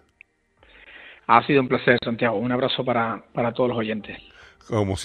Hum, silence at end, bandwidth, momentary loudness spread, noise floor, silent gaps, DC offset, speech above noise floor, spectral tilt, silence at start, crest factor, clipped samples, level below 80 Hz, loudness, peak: none; 0 s; 10 kHz; 17 LU; -59 dBFS; none; under 0.1%; 37 dB; -6 dB/octave; 0.9 s; 22 dB; under 0.1%; -54 dBFS; -22 LUFS; -2 dBFS